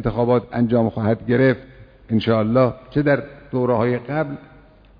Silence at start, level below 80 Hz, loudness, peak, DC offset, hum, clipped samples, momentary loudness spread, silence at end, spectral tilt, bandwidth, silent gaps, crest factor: 0 s; -46 dBFS; -20 LUFS; -4 dBFS; under 0.1%; none; under 0.1%; 7 LU; 0.55 s; -10.5 dB/octave; 5.2 kHz; none; 16 dB